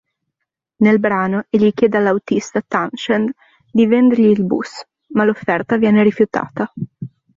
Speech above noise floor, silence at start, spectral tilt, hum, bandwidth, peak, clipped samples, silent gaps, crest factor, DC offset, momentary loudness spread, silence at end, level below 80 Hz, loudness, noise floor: 63 dB; 0.8 s; -7 dB/octave; none; 7.6 kHz; -2 dBFS; under 0.1%; none; 14 dB; under 0.1%; 12 LU; 0.3 s; -56 dBFS; -16 LUFS; -78 dBFS